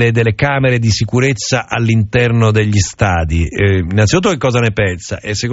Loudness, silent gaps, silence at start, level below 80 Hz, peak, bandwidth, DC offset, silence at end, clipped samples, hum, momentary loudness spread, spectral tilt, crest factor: -13 LUFS; none; 0 s; -32 dBFS; 0 dBFS; 8 kHz; under 0.1%; 0 s; under 0.1%; none; 5 LU; -5.5 dB/octave; 12 dB